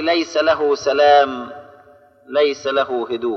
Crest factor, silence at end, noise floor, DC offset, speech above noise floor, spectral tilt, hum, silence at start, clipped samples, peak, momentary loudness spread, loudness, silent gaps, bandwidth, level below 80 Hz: 16 dB; 0 s; -48 dBFS; under 0.1%; 32 dB; -3.5 dB/octave; none; 0 s; under 0.1%; -2 dBFS; 10 LU; -17 LUFS; none; 6.8 kHz; -60 dBFS